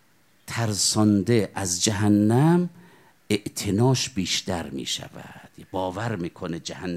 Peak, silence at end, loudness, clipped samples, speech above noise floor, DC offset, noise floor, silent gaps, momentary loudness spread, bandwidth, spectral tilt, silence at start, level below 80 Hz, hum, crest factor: -6 dBFS; 0 s; -24 LUFS; under 0.1%; 30 dB; under 0.1%; -53 dBFS; none; 13 LU; 15.5 kHz; -4.5 dB/octave; 0.45 s; -60 dBFS; none; 18 dB